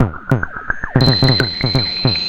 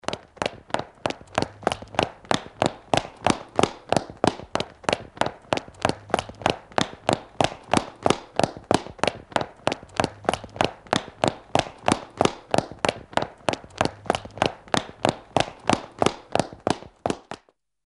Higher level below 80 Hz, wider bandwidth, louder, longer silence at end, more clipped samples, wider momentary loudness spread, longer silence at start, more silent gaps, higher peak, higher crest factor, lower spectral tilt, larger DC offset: first, -32 dBFS vs -50 dBFS; about the same, 11 kHz vs 11.5 kHz; first, -15 LUFS vs -26 LUFS; second, 0 s vs 0.5 s; neither; about the same, 8 LU vs 6 LU; about the same, 0 s vs 0.1 s; neither; about the same, 0 dBFS vs -2 dBFS; second, 16 dB vs 24 dB; first, -6.5 dB/octave vs -4.5 dB/octave; neither